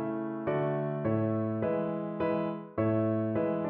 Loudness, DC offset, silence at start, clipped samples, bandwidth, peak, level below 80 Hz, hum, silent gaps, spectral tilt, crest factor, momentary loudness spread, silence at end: -31 LUFS; under 0.1%; 0 s; under 0.1%; 4.3 kHz; -16 dBFS; -64 dBFS; none; none; -8.5 dB/octave; 14 dB; 5 LU; 0 s